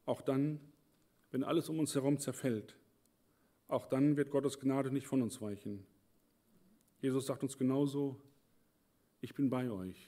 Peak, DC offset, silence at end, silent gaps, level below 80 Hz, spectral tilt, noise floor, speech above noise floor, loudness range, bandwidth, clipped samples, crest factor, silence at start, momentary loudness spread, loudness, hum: -20 dBFS; under 0.1%; 0.05 s; none; -82 dBFS; -6.5 dB/octave; -75 dBFS; 39 dB; 3 LU; 16 kHz; under 0.1%; 18 dB; 0.05 s; 11 LU; -37 LUFS; none